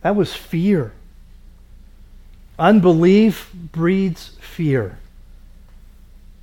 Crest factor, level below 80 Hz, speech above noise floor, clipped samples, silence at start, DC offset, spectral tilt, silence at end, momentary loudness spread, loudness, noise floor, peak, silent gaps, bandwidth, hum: 18 dB; -42 dBFS; 26 dB; under 0.1%; 0.05 s; under 0.1%; -8 dB/octave; 1.35 s; 18 LU; -17 LUFS; -43 dBFS; -2 dBFS; none; 17 kHz; none